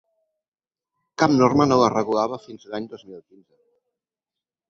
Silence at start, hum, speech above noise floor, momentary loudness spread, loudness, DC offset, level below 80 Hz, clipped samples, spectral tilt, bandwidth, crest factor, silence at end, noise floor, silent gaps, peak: 1.2 s; none; over 69 dB; 20 LU; -19 LUFS; under 0.1%; -60 dBFS; under 0.1%; -6 dB/octave; 7.4 kHz; 22 dB; 1.5 s; under -90 dBFS; none; -2 dBFS